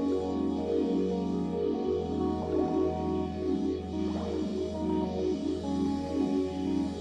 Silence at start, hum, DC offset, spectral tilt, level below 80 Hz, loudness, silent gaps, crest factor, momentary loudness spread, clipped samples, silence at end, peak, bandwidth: 0 s; none; under 0.1%; -8 dB/octave; -48 dBFS; -31 LUFS; none; 12 dB; 3 LU; under 0.1%; 0 s; -18 dBFS; 9.6 kHz